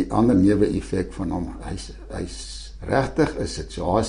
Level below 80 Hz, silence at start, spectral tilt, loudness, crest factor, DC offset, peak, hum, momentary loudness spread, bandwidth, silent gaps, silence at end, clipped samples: -36 dBFS; 0 s; -6.5 dB/octave; -23 LUFS; 18 dB; under 0.1%; -4 dBFS; none; 17 LU; 10.5 kHz; none; 0 s; under 0.1%